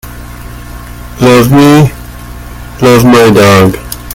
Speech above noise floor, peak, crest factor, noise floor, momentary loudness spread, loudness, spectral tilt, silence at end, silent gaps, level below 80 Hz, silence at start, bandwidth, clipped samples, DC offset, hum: 20 dB; 0 dBFS; 8 dB; -24 dBFS; 22 LU; -5 LUFS; -6 dB/octave; 0 s; none; -28 dBFS; 0.05 s; 19 kHz; 3%; under 0.1%; 60 Hz at -25 dBFS